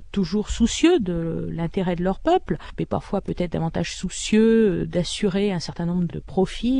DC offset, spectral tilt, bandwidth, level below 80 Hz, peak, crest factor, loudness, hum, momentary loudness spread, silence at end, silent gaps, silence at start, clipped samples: under 0.1%; -5.5 dB/octave; 10.5 kHz; -38 dBFS; -4 dBFS; 18 dB; -23 LUFS; none; 10 LU; 0 s; none; 0 s; under 0.1%